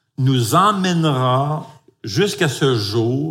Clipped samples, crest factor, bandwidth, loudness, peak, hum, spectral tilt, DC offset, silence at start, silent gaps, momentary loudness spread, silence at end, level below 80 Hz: under 0.1%; 16 dB; 16.5 kHz; -17 LUFS; -2 dBFS; none; -5.5 dB/octave; under 0.1%; 0.2 s; none; 9 LU; 0 s; -58 dBFS